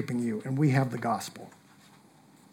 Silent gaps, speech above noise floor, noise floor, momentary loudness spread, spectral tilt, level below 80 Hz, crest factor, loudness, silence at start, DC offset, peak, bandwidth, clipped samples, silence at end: none; 29 dB; -58 dBFS; 20 LU; -7 dB/octave; -80 dBFS; 20 dB; -29 LUFS; 0 s; under 0.1%; -12 dBFS; 16.5 kHz; under 0.1%; 1.05 s